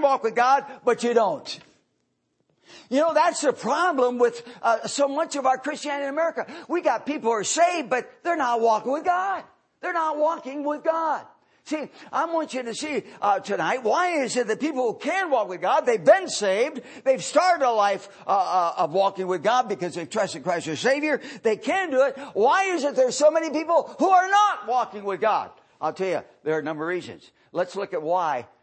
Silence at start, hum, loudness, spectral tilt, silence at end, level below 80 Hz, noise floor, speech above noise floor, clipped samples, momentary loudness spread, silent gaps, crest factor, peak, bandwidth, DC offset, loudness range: 0 s; none; -24 LUFS; -3.5 dB/octave; 0.2 s; -78 dBFS; -73 dBFS; 50 dB; under 0.1%; 9 LU; none; 18 dB; -4 dBFS; 8.8 kHz; under 0.1%; 5 LU